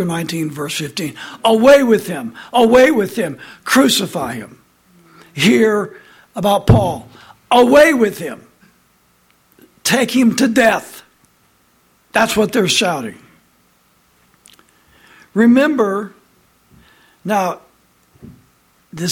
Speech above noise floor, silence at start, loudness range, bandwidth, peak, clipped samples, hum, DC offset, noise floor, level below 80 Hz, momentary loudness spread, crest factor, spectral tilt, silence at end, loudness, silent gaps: 42 dB; 0 s; 6 LU; 17 kHz; 0 dBFS; under 0.1%; none; under 0.1%; -56 dBFS; -42 dBFS; 19 LU; 16 dB; -4.5 dB/octave; 0 s; -14 LUFS; none